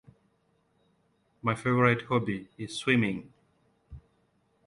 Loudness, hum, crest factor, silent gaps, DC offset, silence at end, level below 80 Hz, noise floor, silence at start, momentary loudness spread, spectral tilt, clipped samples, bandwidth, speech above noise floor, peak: -28 LUFS; none; 22 dB; none; under 0.1%; 0.65 s; -60 dBFS; -71 dBFS; 1.45 s; 13 LU; -6 dB/octave; under 0.1%; 11.5 kHz; 43 dB; -10 dBFS